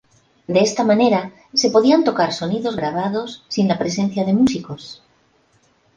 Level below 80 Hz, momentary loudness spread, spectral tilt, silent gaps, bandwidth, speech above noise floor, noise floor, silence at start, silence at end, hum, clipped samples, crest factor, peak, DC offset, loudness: -58 dBFS; 11 LU; -5 dB/octave; none; 9.8 kHz; 41 dB; -59 dBFS; 0.5 s; 1 s; none; under 0.1%; 16 dB; -2 dBFS; under 0.1%; -18 LUFS